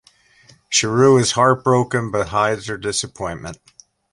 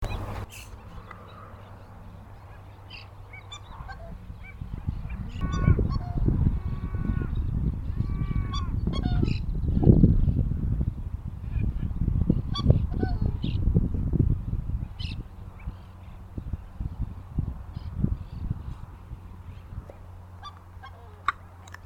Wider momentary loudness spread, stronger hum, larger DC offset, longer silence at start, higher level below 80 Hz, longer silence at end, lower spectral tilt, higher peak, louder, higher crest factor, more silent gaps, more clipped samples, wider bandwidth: second, 14 LU vs 21 LU; neither; neither; first, 0.7 s vs 0 s; second, -48 dBFS vs -32 dBFS; first, 0.6 s vs 0 s; second, -4 dB/octave vs -8.5 dB/octave; about the same, -2 dBFS vs -4 dBFS; first, -18 LUFS vs -28 LUFS; second, 18 dB vs 24 dB; neither; neither; about the same, 11.5 kHz vs 11 kHz